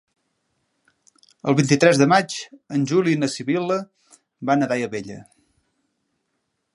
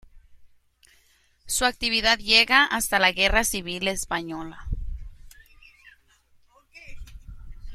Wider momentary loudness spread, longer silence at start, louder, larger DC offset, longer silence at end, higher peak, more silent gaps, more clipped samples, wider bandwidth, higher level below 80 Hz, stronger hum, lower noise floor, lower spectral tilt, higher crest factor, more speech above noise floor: second, 16 LU vs 19 LU; first, 1.45 s vs 0.15 s; about the same, -20 LUFS vs -21 LUFS; neither; first, 1.55 s vs 0 s; about the same, 0 dBFS vs -2 dBFS; neither; neither; second, 11.5 kHz vs 16 kHz; second, -68 dBFS vs -40 dBFS; neither; first, -75 dBFS vs -62 dBFS; first, -5.5 dB/octave vs -1.5 dB/octave; about the same, 22 dB vs 24 dB; first, 55 dB vs 39 dB